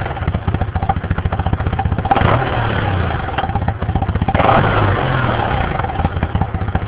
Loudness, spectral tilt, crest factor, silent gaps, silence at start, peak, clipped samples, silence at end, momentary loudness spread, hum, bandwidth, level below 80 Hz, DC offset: -17 LUFS; -11 dB/octave; 16 dB; none; 0 s; 0 dBFS; under 0.1%; 0 s; 7 LU; none; 4 kHz; -24 dBFS; under 0.1%